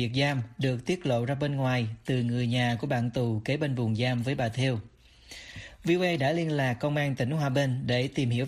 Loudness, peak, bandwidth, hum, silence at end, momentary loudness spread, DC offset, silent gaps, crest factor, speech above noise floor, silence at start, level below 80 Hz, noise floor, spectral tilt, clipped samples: -28 LUFS; -14 dBFS; 12.5 kHz; none; 0 s; 4 LU; under 0.1%; none; 14 dB; 22 dB; 0 s; -58 dBFS; -50 dBFS; -6.5 dB/octave; under 0.1%